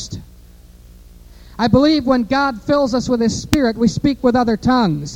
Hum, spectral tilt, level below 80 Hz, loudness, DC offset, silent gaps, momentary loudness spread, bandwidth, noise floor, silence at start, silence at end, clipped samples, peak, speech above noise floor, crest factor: 60 Hz at -45 dBFS; -6 dB/octave; -38 dBFS; -16 LUFS; under 0.1%; none; 5 LU; over 20 kHz; -42 dBFS; 0 s; 0 s; under 0.1%; 0 dBFS; 27 dB; 16 dB